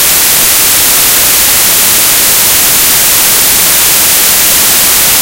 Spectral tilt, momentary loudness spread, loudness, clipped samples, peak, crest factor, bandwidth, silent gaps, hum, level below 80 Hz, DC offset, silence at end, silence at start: 0.5 dB/octave; 0 LU; -3 LUFS; 5%; 0 dBFS; 6 dB; over 20 kHz; none; none; -32 dBFS; under 0.1%; 0 s; 0 s